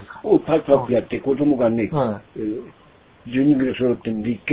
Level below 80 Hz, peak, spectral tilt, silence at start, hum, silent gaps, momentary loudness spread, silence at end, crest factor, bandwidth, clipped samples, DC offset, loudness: -52 dBFS; -2 dBFS; -11.5 dB/octave; 0 s; none; none; 10 LU; 0 s; 18 dB; 4 kHz; under 0.1%; under 0.1%; -20 LUFS